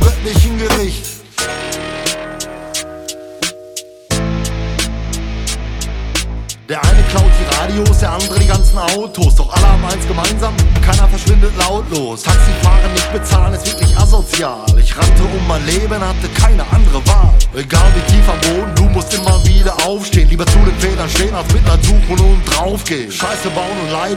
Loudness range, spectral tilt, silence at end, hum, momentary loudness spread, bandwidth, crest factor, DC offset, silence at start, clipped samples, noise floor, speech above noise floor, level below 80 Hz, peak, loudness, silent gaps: 8 LU; -4.5 dB/octave; 0 s; none; 10 LU; 16 kHz; 10 dB; under 0.1%; 0 s; under 0.1%; -31 dBFS; 21 dB; -12 dBFS; 0 dBFS; -14 LUFS; none